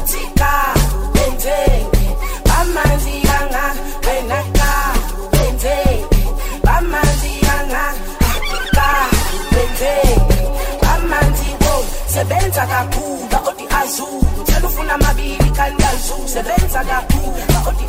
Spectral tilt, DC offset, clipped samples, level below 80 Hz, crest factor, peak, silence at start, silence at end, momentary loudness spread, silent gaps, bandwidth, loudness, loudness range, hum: -4.5 dB/octave; under 0.1%; under 0.1%; -16 dBFS; 12 dB; -2 dBFS; 0 s; 0 s; 5 LU; none; 16.5 kHz; -16 LUFS; 2 LU; none